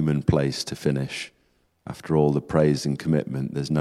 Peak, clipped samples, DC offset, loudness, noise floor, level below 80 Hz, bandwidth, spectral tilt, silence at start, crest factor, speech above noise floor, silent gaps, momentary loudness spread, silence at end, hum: -6 dBFS; under 0.1%; under 0.1%; -24 LUFS; -66 dBFS; -46 dBFS; 13 kHz; -6.5 dB/octave; 0 s; 18 dB; 43 dB; none; 16 LU; 0 s; none